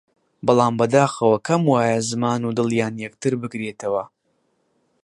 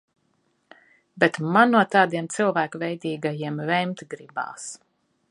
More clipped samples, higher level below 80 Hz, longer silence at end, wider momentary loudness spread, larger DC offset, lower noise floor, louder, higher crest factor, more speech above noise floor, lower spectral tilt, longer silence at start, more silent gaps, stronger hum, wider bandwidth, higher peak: neither; first, -62 dBFS vs -76 dBFS; first, 1 s vs 0.55 s; second, 10 LU vs 17 LU; neither; about the same, -68 dBFS vs -69 dBFS; first, -20 LUFS vs -23 LUFS; second, 18 dB vs 24 dB; about the same, 48 dB vs 46 dB; about the same, -6 dB/octave vs -5 dB/octave; second, 0.45 s vs 1.15 s; neither; neither; about the same, 11.5 kHz vs 11.5 kHz; about the same, -2 dBFS vs -2 dBFS